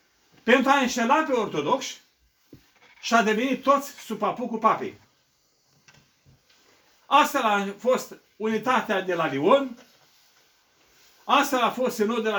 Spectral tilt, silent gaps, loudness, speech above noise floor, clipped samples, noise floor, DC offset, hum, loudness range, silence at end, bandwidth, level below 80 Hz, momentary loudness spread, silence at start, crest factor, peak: -4 dB/octave; none; -23 LUFS; 44 dB; under 0.1%; -67 dBFS; under 0.1%; none; 4 LU; 0 s; over 20 kHz; -70 dBFS; 12 LU; 0.45 s; 22 dB; -4 dBFS